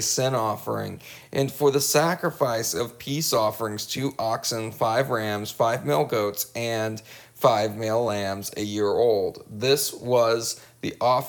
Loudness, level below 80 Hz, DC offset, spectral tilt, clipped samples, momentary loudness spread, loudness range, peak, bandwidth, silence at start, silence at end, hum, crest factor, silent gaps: -25 LUFS; -64 dBFS; under 0.1%; -4 dB/octave; under 0.1%; 9 LU; 1 LU; -4 dBFS; over 20 kHz; 0 s; 0 s; none; 20 dB; none